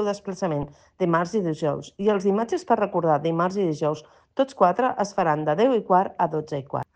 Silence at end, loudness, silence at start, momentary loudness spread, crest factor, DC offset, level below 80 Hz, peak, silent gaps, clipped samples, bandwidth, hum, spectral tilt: 0.15 s; -24 LUFS; 0 s; 8 LU; 18 dB; under 0.1%; -60 dBFS; -6 dBFS; none; under 0.1%; 9.4 kHz; none; -6.5 dB/octave